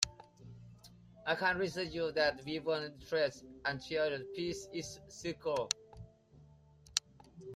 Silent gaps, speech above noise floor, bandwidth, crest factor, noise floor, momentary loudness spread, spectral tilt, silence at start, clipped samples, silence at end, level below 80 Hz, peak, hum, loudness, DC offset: none; 25 dB; 15 kHz; 28 dB; -62 dBFS; 23 LU; -3 dB/octave; 0 s; under 0.1%; 0 s; -66 dBFS; -10 dBFS; none; -37 LUFS; under 0.1%